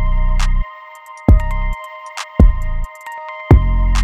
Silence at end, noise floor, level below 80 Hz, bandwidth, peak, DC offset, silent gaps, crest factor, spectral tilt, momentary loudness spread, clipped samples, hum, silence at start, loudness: 0 s; -36 dBFS; -16 dBFS; 9.4 kHz; 0 dBFS; under 0.1%; none; 14 dB; -7 dB/octave; 16 LU; under 0.1%; none; 0 s; -17 LUFS